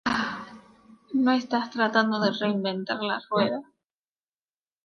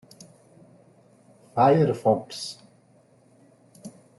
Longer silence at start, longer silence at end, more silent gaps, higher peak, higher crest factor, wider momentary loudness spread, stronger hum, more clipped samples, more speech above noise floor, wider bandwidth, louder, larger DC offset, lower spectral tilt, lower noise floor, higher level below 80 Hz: second, 0.05 s vs 1.55 s; first, 1.25 s vs 0.3 s; neither; about the same, -6 dBFS vs -6 dBFS; about the same, 20 dB vs 22 dB; second, 9 LU vs 27 LU; neither; neither; first, over 65 dB vs 37 dB; second, 7 kHz vs 12 kHz; second, -26 LUFS vs -23 LUFS; neither; about the same, -5.5 dB/octave vs -6.5 dB/octave; first, under -90 dBFS vs -59 dBFS; about the same, -66 dBFS vs -68 dBFS